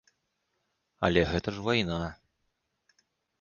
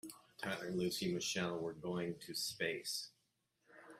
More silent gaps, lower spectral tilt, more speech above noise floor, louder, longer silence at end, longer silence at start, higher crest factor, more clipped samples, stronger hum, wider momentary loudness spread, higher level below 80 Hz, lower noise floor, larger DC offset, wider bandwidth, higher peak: neither; first, -6 dB/octave vs -3.5 dB/octave; first, 51 dB vs 41 dB; first, -29 LUFS vs -41 LUFS; first, 1.25 s vs 0 s; first, 1 s vs 0.05 s; first, 24 dB vs 18 dB; neither; neither; first, 9 LU vs 6 LU; first, -48 dBFS vs -76 dBFS; about the same, -79 dBFS vs -82 dBFS; neither; second, 7.2 kHz vs 15.5 kHz; first, -8 dBFS vs -24 dBFS